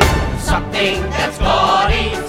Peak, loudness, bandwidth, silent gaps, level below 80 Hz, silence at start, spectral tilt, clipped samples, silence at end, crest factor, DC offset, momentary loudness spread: 0 dBFS; -16 LUFS; 17 kHz; none; -22 dBFS; 0 s; -4.5 dB/octave; under 0.1%; 0 s; 16 dB; under 0.1%; 6 LU